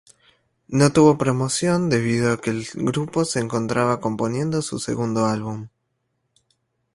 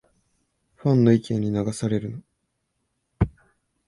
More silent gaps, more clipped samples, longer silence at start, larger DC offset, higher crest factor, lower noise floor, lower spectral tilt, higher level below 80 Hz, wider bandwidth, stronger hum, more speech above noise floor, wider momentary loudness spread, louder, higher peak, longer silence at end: neither; neither; second, 0.7 s vs 0.85 s; neither; about the same, 20 dB vs 20 dB; about the same, -73 dBFS vs -75 dBFS; second, -5.5 dB/octave vs -8 dB/octave; second, -54 dBFS vs -44 dBFS; about the same, 11.5 kHz vs 11.5 kHz; neither; about the same, 53 dB vs 54 dB; about the same, 10 LU vs 10 LU; about the same, -21 LUFS vs -23 LUFS; about the same, -2 dBFS vs -4 dBFS; first, 1.25 s vs 0.6 s